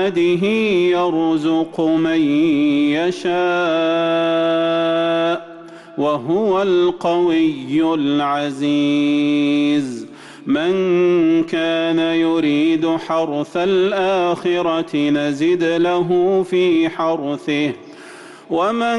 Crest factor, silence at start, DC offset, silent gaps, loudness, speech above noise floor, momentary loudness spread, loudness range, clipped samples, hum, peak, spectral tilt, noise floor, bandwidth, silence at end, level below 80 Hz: 8 dB; 0 s; under 0.1%; none; -17 LUFS; 22 dB; 6 LU; 1 LU; under 0.1%; none; -8 dBFS; -6 dB/octave; -38 dBFS; 11 kHz; 0 s; -58 dBFS